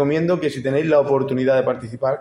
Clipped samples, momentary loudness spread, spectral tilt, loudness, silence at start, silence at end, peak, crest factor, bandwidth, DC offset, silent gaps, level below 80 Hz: under 0.1%; 7 LU; -7.5 dB/octave; -19 LUFS; 0 s; 0 s; -4 dBFS; 14 dB; 11.5 kHz; under 0.1%; none; -58 dBFS